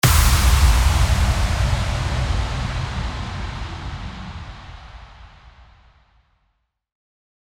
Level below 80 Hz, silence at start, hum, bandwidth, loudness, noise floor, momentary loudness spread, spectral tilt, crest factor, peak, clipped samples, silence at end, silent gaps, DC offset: -22 dBFS; 0.05 s; none; over 20 kHz; -20 LUFS; -70 dBFS; 22 LU; -4 dB/octave; 18 dB; -2 dBFS; under 0.1%; 2.2 s; none; under 0.1%